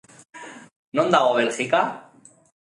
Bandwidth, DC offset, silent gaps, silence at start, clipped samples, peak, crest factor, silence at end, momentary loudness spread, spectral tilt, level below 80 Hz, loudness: 11.5 kHz; under 0.1%; 0.76-0.92 s; 0.35 s; under 0.1%; -2 dBFS; 22 dB; 0.8 s; 23 LU; -4 dB/octave; -74 dBFS; -21 LUFS